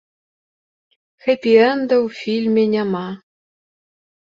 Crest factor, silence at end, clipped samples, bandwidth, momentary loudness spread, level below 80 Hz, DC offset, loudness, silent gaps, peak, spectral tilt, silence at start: 18 dB; 1.05 s; under 0.1%; 7.4 kHz; 12 LU; -66 dBFS; under 0.1%; -17 LUFS; none; -2 dBFS; -7 dB/octave; 1.25 s